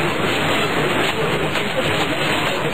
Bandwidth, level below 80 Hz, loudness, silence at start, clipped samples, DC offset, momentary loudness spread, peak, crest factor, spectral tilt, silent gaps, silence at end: 16 kHz; -44 dBFS; -19 LUFS; 0 s; under 0.1%; 3%; 2 LU; -6 dBFS; 12 dB; -4 dB/octave; none; 0 s